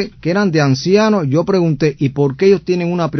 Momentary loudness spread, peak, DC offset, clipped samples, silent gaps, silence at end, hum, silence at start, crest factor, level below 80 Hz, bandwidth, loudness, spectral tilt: 4 LU; 0 dBFS; under 0.1%; under 0.1%; none; 0 s; none; 0 s; 14 dB; -48 dBFS; 6.4 kHz; -14 LUFS; -7 dB/octave